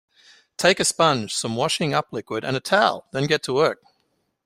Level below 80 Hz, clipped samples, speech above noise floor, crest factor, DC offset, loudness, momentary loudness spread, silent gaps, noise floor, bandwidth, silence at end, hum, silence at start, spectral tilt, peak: -60 dBFS; under 0.1%; 49 dB; 20 dB; under 0.1%; -21 LUFS; 9 LU; none; -71 dBFS; 15.5 kHz; 0.7 s; none; 0.6 s; -3.5 dB/octave; -2 dBFS